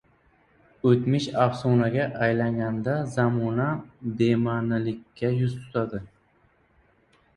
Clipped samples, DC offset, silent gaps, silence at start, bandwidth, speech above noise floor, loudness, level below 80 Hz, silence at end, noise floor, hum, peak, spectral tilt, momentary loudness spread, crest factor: under 0.1%; under 0.1%; none; 0.85 s; 10.5 kHz; 39 dB; -25 LUFS; -58 dBFS; 1.3 s; -63 dBFS; none; -6 dBFS; -8 dB/octave; 7 LU; 20 dB